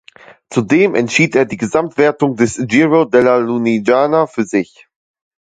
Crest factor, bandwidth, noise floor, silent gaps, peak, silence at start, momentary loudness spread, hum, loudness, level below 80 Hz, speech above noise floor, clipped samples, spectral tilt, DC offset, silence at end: 14 dB; 9.4 kHz; -40 dBFS; none; 0 dBFS; 0.5 s; 7 LU; none; -14 LUFS; -54 dBFS; 27 dB; under 0.1%; -5.5 dB/octave; under 0.1%; 0.85 s